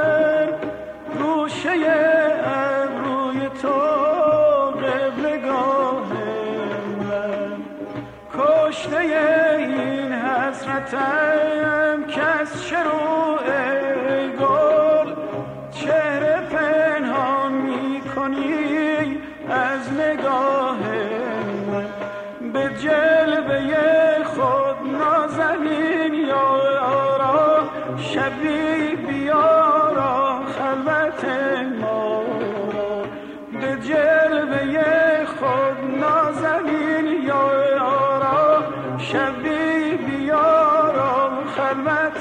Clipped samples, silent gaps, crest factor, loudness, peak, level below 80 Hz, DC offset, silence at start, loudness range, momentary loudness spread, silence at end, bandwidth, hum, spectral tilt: under 0.1%; none; 14 dB; -20 LUFS; -6 dBFS; -56 dBFS; under 0.1%; 0 s; 4 LU; 9 LU; 0 s; 9.4 kHz; none; -6 dB/octave